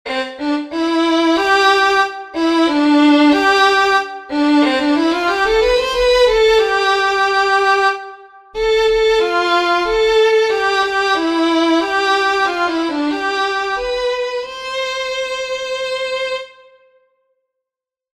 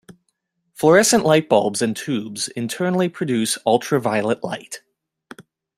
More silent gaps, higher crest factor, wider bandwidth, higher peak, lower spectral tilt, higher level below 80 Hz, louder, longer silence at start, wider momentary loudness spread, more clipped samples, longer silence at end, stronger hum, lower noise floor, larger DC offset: neither; about the same, 14 dB vs 18 dB; second, 14 kHz vs 16 kHz; about the same, -2 dBFS vs -2 dBFS; second, -2.5 dB/octave vs -4 dB/octave; first, -42 dBFS vs -62 dBFS; first, -15 LUFS vs -19 LUFS; second, 0.05 s vs 0.8 s; second, 9 LU vs 12 LU; neither; first, 1.7 s vs 0.35 s; neither; first, -86 dBFS vs -72 dBFS; neither